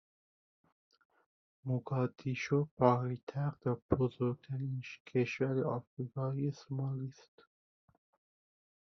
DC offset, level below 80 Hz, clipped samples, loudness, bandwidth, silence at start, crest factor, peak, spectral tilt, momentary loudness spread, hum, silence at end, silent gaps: under 0.1%; -66 dBFS; under 0.1%; -36 LUFS; 6.4 kHz; 1.65 s; 24 dB; -14 dBFS; -7.5 dB/octave; 11 LU; none; 1.75 s; 2.71-2.77 s, 3.23-3.27 s, 3.82-3.89 s, 5.00-5.05 s, 5.87-5.97 s